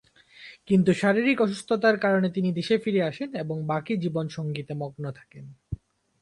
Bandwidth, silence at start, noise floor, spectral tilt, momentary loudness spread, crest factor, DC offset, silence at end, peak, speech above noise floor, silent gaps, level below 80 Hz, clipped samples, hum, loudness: 11.5 kHz; 0.4 s; -50 dBFS; -7 dB/octave; 18 LU; 18 dB; under 0.1%; 0.45 s; -8 dBFS; 25 dB; none; -56 dBFS; under 0.1%; none; -25 LUFS